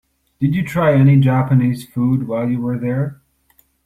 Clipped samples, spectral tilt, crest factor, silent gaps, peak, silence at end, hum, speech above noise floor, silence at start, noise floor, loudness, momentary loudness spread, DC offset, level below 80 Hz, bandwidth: under 0.1%; -9 dB/octave; 14 dB; none; -2 dBFS; 0.7 s; none; 42 dB; 0.4 s; -58 dBFS; -17 LUFS; 9 LU; under 0.1%; -50 dBFS; 13 kHz